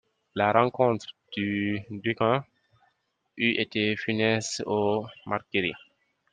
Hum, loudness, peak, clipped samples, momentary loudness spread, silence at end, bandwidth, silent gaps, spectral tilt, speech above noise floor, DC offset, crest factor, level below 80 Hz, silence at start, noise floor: none; -27 LUFS; -4 dBFS; under 0.1%; 10 LU; 0.55 s; 9.6 kHz; none; -5 dB/octave; 47 dB; under 0.1%; 24 dB; -68 dBFS; 0.35 s; -73 dBFS